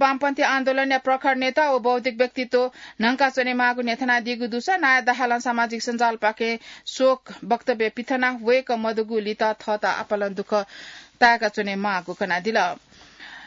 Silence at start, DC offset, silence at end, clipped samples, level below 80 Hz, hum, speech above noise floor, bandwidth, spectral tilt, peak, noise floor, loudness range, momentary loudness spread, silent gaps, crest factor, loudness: 0 s; under 0.1%; 0 s; under 0.1%; -68 dBFS; none; 22 dB; 7.8 kHz; -4 dB/octave; -4 dBFS; -44 dBFS; 2 LU; 7 LU; none; 18 dB; -22 LUFS